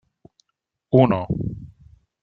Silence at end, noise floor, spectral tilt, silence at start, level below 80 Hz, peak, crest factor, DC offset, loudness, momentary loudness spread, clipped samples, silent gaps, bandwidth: 0.55 s; -79 dBFS; -10.5 dB/octave; 0.9 s; -48 dBFS; -2 dBFS; 22 dB; under 0.1%; -20 LUFS; 15 LU; under 0.1%; none; 4.6 kHz